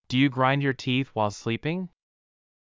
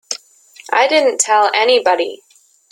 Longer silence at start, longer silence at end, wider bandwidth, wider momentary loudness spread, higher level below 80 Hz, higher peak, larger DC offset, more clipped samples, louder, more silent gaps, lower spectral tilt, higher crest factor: about the same, 0.1 s vs 0.1 s; first, 0.9 s vs 0.55 s; second, 7.6 kHz vs 13.5 kHz; about the same, 10 LU vs 12 LU; first, -62 dBFS vs -68 dBFS; second, -10 dBFS vs 0 dBFS; neither; neither; second, -26 LUFS vs -14 LUFS; neither; first, -6 dB/octave vs 1 dB/octave; about the same, 18 dB vs 16 dB